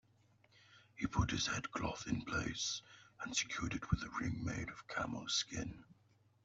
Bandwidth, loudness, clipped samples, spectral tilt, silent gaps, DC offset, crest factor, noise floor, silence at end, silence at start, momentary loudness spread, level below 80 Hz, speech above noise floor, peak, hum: 8.2 kHz; -40 LUFS; under 0.1%; -3.5 dB/octave; none; under 0.1%; 22 dB; -72 dBFS; 0.6 s; 0.7 s; 9 LU; -56 dBFS; 31 dB; -20 dBFS; none